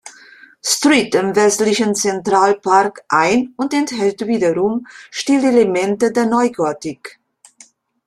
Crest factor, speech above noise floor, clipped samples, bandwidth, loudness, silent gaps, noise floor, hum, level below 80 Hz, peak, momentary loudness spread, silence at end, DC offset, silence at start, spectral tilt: 16 dB; 33 dB; under 0.1%; 15 kHz; -16 LUFS; none; -49 dBFS; none; -58 dBFS; 0 dBFS; 11 LU; 0.95 s; under 0.1%; 0.05 s; -3.5 dB/octave